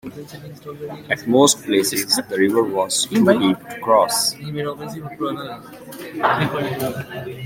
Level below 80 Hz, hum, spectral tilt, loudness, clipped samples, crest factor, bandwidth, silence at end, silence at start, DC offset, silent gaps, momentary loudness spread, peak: -58 dBFS; none; -3.5 dB/octave; -19 LUFS; under 0.1%; 18 dB; 16.5 kHz; 0 s; 0.05 s; under 0.1%; none; 20 LU; -2 dBFS